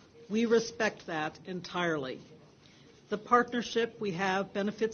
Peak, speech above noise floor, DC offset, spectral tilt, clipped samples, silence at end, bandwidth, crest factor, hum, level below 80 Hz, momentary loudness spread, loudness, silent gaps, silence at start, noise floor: -10 dBFS; 26 dB; under 0.1%; -4.5 dB/octave; under 0.1%; 0 s; 7 kHz; 22 dB; none; -70 dBFS; 12 LU; -32 LUFS; none; 0.15 s; -58 dBFS